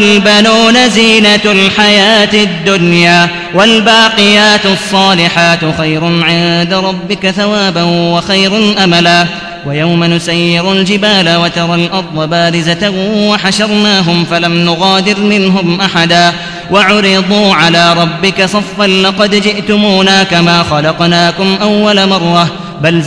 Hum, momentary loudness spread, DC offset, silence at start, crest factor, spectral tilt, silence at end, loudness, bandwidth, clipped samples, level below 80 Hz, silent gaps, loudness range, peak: none; 6 LU; 0.2%; 0 s; 8 dB; -4.5 dB/octave; 0 s; -7 LUFS; 11 kHz; 2%; -40 dBFS; none; 4 LU; 0 dBFS